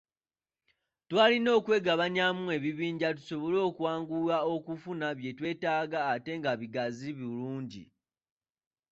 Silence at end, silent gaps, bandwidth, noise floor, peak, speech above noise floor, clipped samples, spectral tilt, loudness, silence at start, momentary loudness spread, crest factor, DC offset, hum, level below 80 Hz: 1.05 s; none; 7.8 kHz; under -90 dBFS; -10 dBFS; over 60 dB; under 0.1%; -6 dB/octave; -31 LUFS; 1.1 s; 12 LU; 20 dB; under 0.1%; none; -74 dBFS